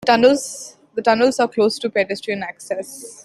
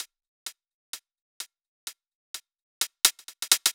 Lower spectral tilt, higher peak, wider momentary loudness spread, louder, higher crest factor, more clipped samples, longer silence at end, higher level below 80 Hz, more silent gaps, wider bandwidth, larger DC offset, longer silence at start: first, -3.5 dB/octave vs 4.5 dB/octave; about the same, -2 dBFS vs -2 dBFS; second, 15 LU vs 19 LU; first, -19 LUFS vs -24 LUFS; second, 18 dB vs 30 dB; neither; about the same, 0.05 s vs 0 s; first, -62 dBFS vs under -90 dBFS; second, none vs 0.28-0.46 s, 0.74-0.93 s, 1.21-1.40 s, 1.68-1.87 s, 2.15-2.34 s, 2.62-2.81 s; second, 13 kHz vs over 20 kHz; neither; about the same, 0 s vs 0 s